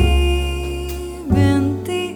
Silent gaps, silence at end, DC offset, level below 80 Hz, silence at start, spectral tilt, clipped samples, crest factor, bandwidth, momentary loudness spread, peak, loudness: none; 0 s; under 0.1%; -22 dBFS; 0 s; -6.5 dB/octave; under 0.1%; 14 dB; 20 kHz; 11 LU; -2 dBFS; -19 LUFS